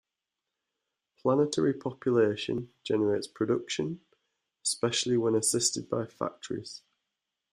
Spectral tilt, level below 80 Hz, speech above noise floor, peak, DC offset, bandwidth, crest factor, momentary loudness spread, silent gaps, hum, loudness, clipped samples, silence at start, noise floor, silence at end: -4 dB/octave; -70 dBFS; 59 dB; -12 dBFS; under 0.1%; 14 kHz; 18 dB; 11 LU; none; none; -29 LUFS; under 0.1%; 1.25 s; -88 dBFS; 0.75 s